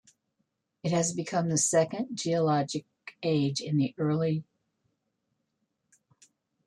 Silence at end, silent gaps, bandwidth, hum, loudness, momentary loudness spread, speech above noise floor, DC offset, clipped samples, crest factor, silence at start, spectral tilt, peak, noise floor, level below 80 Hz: 2.25 s; none; 12.5 kHz; none; -29 LUFS; 10 LU; 52 dB; under 0.1%; under 0.1%; 18 dB; 0.85 s; -5 dB/octave; -14 dBFS; -80 dBFS; -72 dBFS